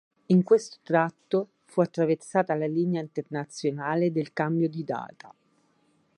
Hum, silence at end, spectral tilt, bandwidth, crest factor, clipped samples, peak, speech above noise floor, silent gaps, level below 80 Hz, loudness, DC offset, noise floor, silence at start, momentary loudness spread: none; 0.9 s; -7 dB/octave; 11 kHz; 18 dB; under 0.1%; -8 dBFS; 41 dB; none; -78 dBFS; -27 LUFS; under 0.1%; -67 dBFS; 0.3 s; 9 LU